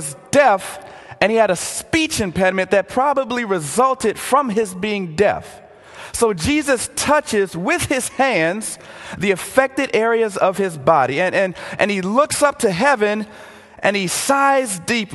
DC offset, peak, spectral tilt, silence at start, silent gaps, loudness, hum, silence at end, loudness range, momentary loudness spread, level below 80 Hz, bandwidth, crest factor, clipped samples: under 0.1%; 0 dBFS; -3.5 dB/octave; 0 s; none; -18 LUFS; none; 0 s; 2 LU; 7 LU; -46 dBFS; 13 kHz; 18 dB; under 0.1%